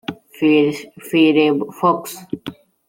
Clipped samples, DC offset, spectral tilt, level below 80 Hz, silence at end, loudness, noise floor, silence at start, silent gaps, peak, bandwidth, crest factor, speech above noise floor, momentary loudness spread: under 0.1%; under 0.1%; -5.5 dB/octave; -62 dBFS; 0.35 s; -16 LUFS; -35 dBFS; 0.1 s; none; -2 dBFS; 16.5 kHz; 16 dB; 19 dB; 17 LU